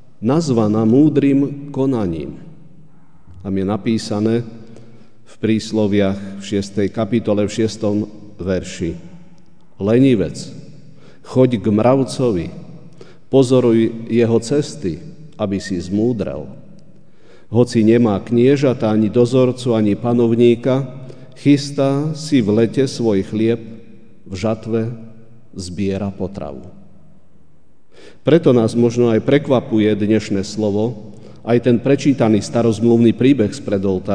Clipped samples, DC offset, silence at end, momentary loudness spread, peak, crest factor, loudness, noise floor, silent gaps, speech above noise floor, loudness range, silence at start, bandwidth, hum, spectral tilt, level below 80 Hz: under 0.1%; 1%; 0 s; 14 LU; 0 dBFS; 18 dB; -17 LUFS; -55 dBFS; none; 40 dB; 7 LU; 0.2 s; 10 kHz; none; -7 dB/octave; -50 dBFS